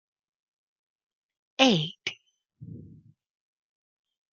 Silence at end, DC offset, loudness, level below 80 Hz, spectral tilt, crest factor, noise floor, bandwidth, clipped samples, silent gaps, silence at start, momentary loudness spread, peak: 1.55 s; under 0.1%; -25 LUFS; -74 dBFS; -4 dB/octave; 28 dB; -58 dBFS; 7.2 kHz; under 0.1%; none; 1.6 s; 24 LU; -4 dBFS